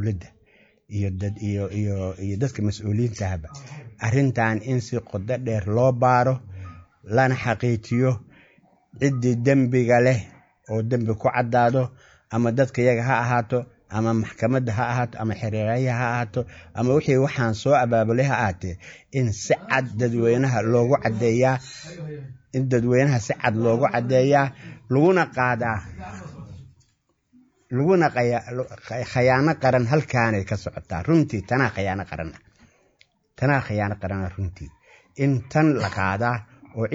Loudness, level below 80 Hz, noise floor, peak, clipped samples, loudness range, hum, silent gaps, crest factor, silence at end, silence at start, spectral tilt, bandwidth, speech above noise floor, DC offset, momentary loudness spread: -22 LUFS; -52 dBFS; -68 dBFS; -4 dBFS; under 0.1%; 4 LU; none; none; 18 dB; 0 s; 0 s; -7 dB/octave; 7.8 kHz; 46 dB; under 0.1%; 14 LU